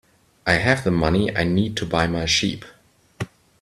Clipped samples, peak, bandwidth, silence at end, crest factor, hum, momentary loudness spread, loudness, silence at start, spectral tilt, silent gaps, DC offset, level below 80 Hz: under 0.1%; -2 dBFS; 13.5 kHz; 0.35 s; 20 dB; none; 16 LU; -20 LUFS; 0.45 s; -4.5 dB/octave; none; under 0.1%; -42 dBFS